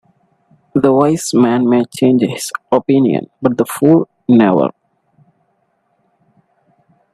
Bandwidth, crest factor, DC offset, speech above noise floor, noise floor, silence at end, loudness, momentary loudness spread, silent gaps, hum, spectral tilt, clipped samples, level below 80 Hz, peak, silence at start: 13.5 kHz; 14 dB; under 0.1%; 50 dB; -62 dBFS; 2.45 s; -13 LUFS; 6 LU; none; none; -6.5 dB/octave; under 0.1%; -58 dBFS; 0 dBFS; 0.75 s